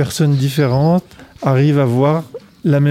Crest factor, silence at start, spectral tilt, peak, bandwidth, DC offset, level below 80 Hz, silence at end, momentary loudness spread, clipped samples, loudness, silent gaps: 12 dB; 0 s; -7.5 dB/octave; -2 dBFS; 15.5 kHz; under 0.1%; -48 dBFS; 0 s; 8 LU; under 0.1%; -15 LUFS; none